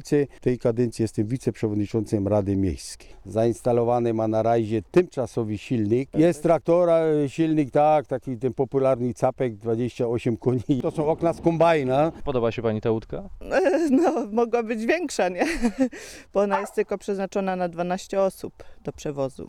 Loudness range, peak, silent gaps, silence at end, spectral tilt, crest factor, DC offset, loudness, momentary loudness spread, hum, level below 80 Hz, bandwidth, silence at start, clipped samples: 4 LU; -8 dBFS; none; 0 s; -7 dB/octave; 14 dB; 0.1%; -24 LUFS; 9 LU; none; -48 dBFS; 13.5 kHz; 0 s; under 0.1%